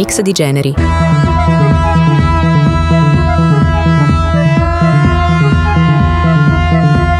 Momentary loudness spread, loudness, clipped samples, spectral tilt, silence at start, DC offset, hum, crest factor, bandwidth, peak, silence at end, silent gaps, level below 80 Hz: 2 LU; -10 LUFS; under 0.1%; -6.5 dB/octave; 0 s; under 0.1%; none; 8 dB; 13 kHz; 0 dBFS; 0 s; none; -20 dBFS